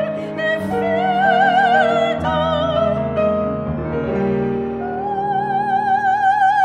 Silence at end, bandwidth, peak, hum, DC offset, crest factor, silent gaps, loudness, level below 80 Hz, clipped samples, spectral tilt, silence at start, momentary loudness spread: 0 s; 10 kHz; -4 dBFS; none; under 0.1%; 14 dB; none; -18 LUFS; -42 dBFS; under 0.1%; -6.5 dB/octave; 0 s; 9 LU